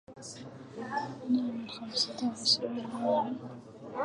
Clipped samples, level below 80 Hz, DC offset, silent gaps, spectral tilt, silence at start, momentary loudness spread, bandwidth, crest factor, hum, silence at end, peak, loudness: under 0.1%; -74 dBFS; under 0.1%; none; -3.5 dB/octave; 0.1 s; 19 LU; 11 kHz; 20 dB; none; 0 s; -14 dBFS; -32 LUFS